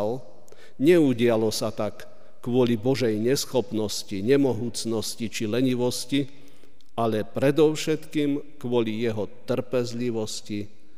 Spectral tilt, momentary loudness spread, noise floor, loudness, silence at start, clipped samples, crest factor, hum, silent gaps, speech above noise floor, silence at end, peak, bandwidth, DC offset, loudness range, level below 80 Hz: -5.5 dB/octave; 11 LU; -57 dBFS; -25 LUFS; 0 s; under 0.1%; 16 dB; none; none; 33 dB; 0.3 s; -8 dBFS; 15.5 kHz; 2%; 3 LU; -62 dBFS